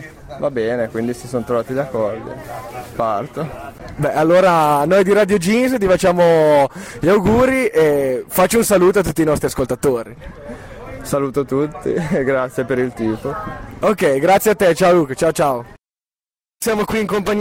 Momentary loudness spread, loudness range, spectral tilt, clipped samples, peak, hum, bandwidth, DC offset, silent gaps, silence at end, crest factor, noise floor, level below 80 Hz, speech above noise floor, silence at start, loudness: 16 LU; 7 LU; -5.5 dB/octave; under 0.1%; -4 dBFS; none; 16.5 kHz; under 0.1%; none; 0 s; 12 dB; under -90 dBFS; -42 dBFS; over 74 dB; 0 s; -16 LUFS